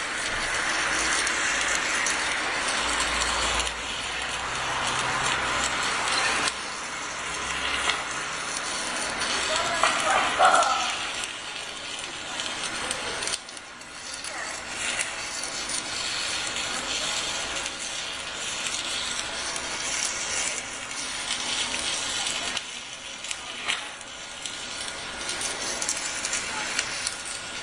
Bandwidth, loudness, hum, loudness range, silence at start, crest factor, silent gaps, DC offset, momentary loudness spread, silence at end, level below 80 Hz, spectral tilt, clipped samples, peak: 11.5 kHz; -26 LUFS; none; 6 LU; 0 s; 24 dB; none; under 0.1%; 9 LU; 0 s; -50 dBFS; 0 dB/octave; under 0.1%; -4 dBFS